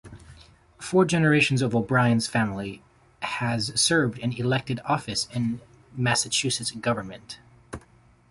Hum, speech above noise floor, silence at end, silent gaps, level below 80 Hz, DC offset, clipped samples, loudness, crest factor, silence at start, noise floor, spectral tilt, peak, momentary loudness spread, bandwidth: none; 32 dB; 0.5 s; none; -56 dBFS; under 0.1%; under 0.1%; -24 LUFS; 18 dB; 0.05 s; -57 dBFS; -4.5 dB/octave; -8 dBFS; 22 LU; 11.5 kHz